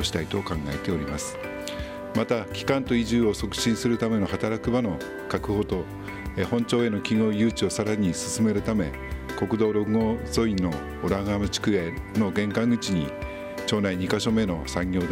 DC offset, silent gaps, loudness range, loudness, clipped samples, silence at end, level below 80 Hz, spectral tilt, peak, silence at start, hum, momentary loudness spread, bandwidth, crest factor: under 0.1%; none; 2 LU; -26 LUFS; under 0.1%; 0 s; -42 dBFS; -5.5 dB/octave; -8 dBFS; 0 s; none; 8 LU; 16 kHz; 18 dB